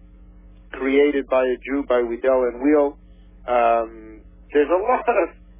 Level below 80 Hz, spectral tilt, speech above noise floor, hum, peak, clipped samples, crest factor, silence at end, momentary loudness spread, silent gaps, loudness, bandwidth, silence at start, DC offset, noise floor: -46 dBFS; -9 dB/octave; 26 dB; none; -6 dBFS; under 0.1%; 16 dB; 0.3 s; 7 LU; none; -20 LUFS; 3.7 kHz; 0.75 s; under 0.1%; -45 dBFS